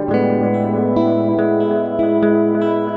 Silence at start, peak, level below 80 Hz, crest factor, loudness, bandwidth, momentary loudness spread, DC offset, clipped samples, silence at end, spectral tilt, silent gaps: 0 s; -2 dBFS; -52 dBFS; 12 dB; -16 LUFS; 4.9 kHz; 3 LU; under 0.1%; under 0.1%; 0 s; -10 dB/octave; none